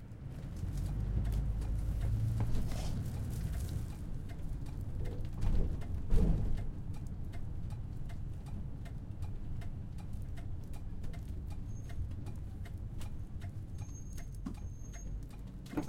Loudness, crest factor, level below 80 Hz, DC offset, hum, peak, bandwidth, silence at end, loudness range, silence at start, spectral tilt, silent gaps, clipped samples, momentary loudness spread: -41 LUFS; 20 dB; -40 dBFS; under 0.1%; none; -16 dBFS; 15.5 kHz; 0 s; 7 LU; 0 s; -7.5 dB/octave; none; under 0.1%; 10 LU